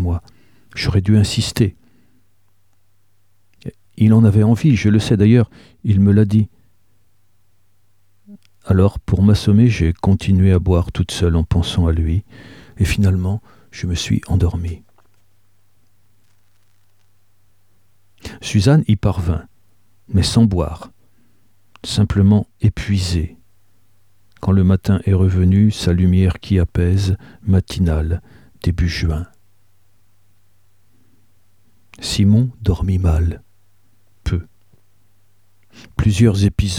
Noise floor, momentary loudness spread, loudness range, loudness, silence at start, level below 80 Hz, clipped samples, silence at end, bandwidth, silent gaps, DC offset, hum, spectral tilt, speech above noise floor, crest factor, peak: -63 dBFS; 13 LU; 9 LU; -17 LUFS; 0 s; -30 dBFS; under 0.1%; 0 s; 13 kHz; none; 0.3%; none; -7 dB/octave; 49 dB; 16 dB; 0 dBFS